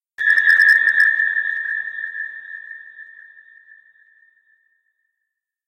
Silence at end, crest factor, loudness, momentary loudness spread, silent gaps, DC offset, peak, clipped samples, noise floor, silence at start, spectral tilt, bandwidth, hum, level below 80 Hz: 2.65 s; 18 dB; -15 LUFS; 23 LU; none; under 0.1%; -2 dBFS; under 0.1%; -80 dBFS; 0.2 s; 1.5 dB/octave; 16.5 kHz; none; -76 dBFS